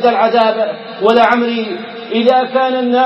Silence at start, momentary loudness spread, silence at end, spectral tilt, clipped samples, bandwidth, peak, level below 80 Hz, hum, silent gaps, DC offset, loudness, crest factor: 0 s; 9 LU; 0 s; -6 dB/octave; under 0.1%; 6.8 kHz; 0 dBFS; -60 dBFS; none; none; under 0.1%; -13 LUFS; 12 dB